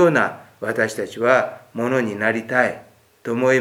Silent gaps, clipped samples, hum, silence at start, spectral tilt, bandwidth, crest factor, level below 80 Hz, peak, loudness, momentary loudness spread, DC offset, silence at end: none; under 0.1%; none; 0 s; -5.5 dB/octave; 16.5 kHz; 20 dB; -70 dBFS; 0 dBFS; -21 LUFS; 11 LU; under 0.1%; 0 s